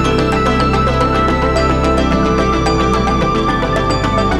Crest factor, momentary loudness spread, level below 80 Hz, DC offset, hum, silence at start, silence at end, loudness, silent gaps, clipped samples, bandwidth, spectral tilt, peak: 12 dB; 2 LU; -22 dBFS; under 0.1%; none; 0 s; 0 s; -14 LUFS; none; under 0.1%; 12 kHz; -6 dB/octave; -2 dBFS